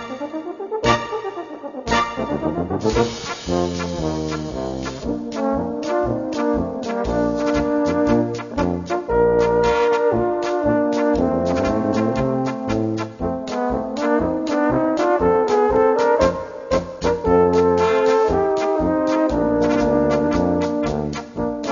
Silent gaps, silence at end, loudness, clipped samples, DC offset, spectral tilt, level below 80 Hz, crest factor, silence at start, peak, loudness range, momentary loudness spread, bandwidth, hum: none; 0 s; -20 LUFS; under 0.1%; under 0.1%; -6.5 dB/octave; -38 dBFS; 16 dB; 0 s; -4 dBFS; 6 LU; 9 LU; 7.4 kHz; none